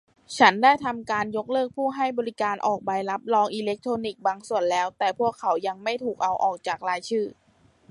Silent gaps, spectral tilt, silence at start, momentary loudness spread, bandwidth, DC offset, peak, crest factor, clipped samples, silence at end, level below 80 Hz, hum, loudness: none; -4 dB/octave; 0.3 s; 9 LU; 11.5 kHz; under 0.1%; -4 dBFS; 22 dB; under 0.1%; 0.6 s; -68 dBFS; none; -25 LUFS